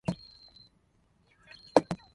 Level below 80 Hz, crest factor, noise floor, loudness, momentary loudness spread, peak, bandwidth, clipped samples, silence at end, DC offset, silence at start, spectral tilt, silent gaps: -62 dBFS; 32 dB; -69 dBFS; -29 LUFS; 25 LU; -4 dBFS; 11.5 kHz; under 0.1%; 0.2 s; under 0.1%; 0.1 s; -6 dB/octave; none